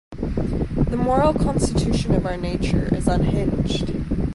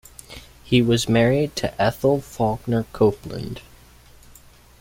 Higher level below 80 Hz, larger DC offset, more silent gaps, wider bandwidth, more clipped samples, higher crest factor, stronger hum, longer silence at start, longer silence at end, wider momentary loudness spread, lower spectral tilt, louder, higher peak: first, -28 dBFS vs -46 dBFS; neither; neither; second, 11.5 kHz vs 16.5 kHz; neither; about the same, 16 dB vs 20 dB; neither; second, 0.1 s vs 0.3 s; second, 0 s vs 1.2 s; second, 6 LU vs 21 LU; about the same, -7 dB/octave vs -6 dB/octave; about the same, -22 LUFS vs -21 LUFS; about the same, -4 dBFS vs -2 dBFS